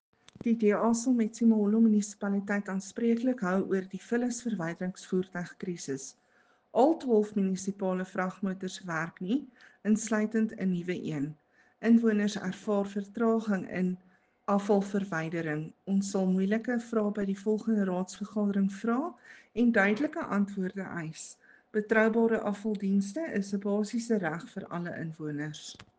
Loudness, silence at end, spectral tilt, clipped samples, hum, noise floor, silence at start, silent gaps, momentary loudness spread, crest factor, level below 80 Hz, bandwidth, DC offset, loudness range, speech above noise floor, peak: -30 LUFS; 0.15 s; -6.5 dB/octave; under 0.1%; none; -67 dBFS; 0.45 s; none; 12 LU; 20 dB; -72 dBFS; 9.6 kHz; under 0.1%; 4 LU; 37 dB; -10 dBFS